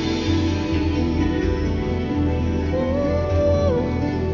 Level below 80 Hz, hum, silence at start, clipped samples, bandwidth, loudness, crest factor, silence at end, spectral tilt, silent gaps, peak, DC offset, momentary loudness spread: -28 dBFS; none; 0 s; under 0.1%; 7.2 kHz; -21 LUFS; 12 dB; 0 s; -7.5 dB/octave; none; -8 dBFS; under 0.1%; 4 LU